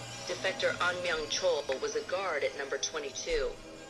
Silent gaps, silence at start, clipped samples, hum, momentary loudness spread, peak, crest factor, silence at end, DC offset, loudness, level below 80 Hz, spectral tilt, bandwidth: none; 0 s; under 0.1%; none; 4 LU; -18 dBFS; 16 dB; 0 s; under 0.1%; -33 LUFS; -52 dBFS; -2 dB/octave; 13 kHz